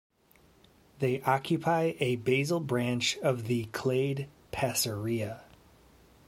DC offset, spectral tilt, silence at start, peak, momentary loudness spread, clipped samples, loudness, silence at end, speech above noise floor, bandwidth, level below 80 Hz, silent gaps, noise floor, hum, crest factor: under 0.1%; -5 dB/octave; 1 s; -12 dBFS; 6 LU; under 0.1%; -30 LUFS; 0.85 s; 33 dB; 16.5 kHz; -62 dBFS; none; -63 dBFS; none; 20 dB